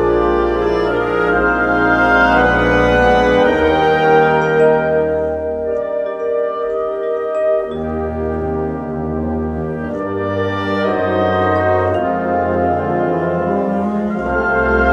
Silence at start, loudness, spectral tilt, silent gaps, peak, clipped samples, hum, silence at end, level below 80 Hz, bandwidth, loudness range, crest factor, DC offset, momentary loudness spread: 0 s; -16 LUFS; -7.5 dB/octave; none; 0 dBFS; under 0.1%; none; 0 s; -32 dBFS; 8.2 kHz; 7 LU; 14 dB; under 0.1%; 9 LU